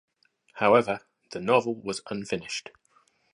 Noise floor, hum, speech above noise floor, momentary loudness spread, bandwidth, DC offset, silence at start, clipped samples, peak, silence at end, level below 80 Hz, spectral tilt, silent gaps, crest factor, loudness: -66 dBFS; none; 40 dB; 14 LU; 11 kHz; under 0.1%; 0.55 s; under 0.1%; -6 dBFS; 0.75 s; -68 dBFS; -4.5 dB/octave; none; 22 dB; -27 LUFS